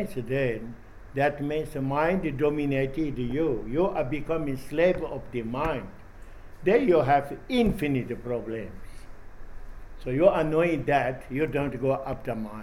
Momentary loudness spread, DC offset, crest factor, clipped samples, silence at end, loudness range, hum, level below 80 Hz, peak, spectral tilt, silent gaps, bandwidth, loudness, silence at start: 12 LU; under 0.1%; 20 dB; under 0.1%; 0 s; 2 LU; none; -42 dBFS; -6 dBFS; -7.5 dB/octave; none; 16.5 kHz; -27 LUFS; 0 s